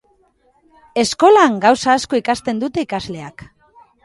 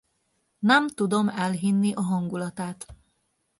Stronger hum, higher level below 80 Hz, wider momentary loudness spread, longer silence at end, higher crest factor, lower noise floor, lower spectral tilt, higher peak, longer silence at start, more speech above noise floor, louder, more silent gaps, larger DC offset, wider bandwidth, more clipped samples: neither; first, -52 dBFS vs -62 dBFS; about the same, 16 LU vs 14 LU; about the same, 0.6 s vs 0.65 s; about the same, 16 dB vs 20 dB; second, -58 dBFS vs -73 dBFS; second, -4 dB/octave vs -5.5 dB/octave; first, 0 dBFS vs -6 dBFS; first, 0.95 s vs 0.6 s; second, 43 dB vs 49 dB; first, -15 LUFS vs -25 LUFS; neither; neither; about the same, 11.5 kHz vs 11.5 kHz; neither